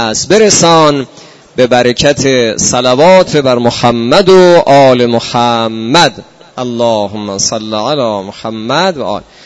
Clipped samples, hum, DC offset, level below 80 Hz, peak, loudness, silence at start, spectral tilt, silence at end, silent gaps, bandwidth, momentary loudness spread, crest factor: 2%; none; under 0.1%; -42 dBFS; 0 dBFS; -8 LUFS; 0 s; -4 dB/octave; 0.25 s; none; 11 kHz; 13 LU; 8 dB